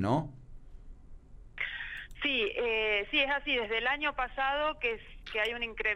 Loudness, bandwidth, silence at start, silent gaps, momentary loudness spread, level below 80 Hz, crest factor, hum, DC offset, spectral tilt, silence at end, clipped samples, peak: -31 LUFS; 13.5 kHz; 0 s; none; 10 LU; -50 dBFS; 18 dB; none; under 0.1%; -5.5 dB/octave; 0 s; under 0.1%; -16 dBFS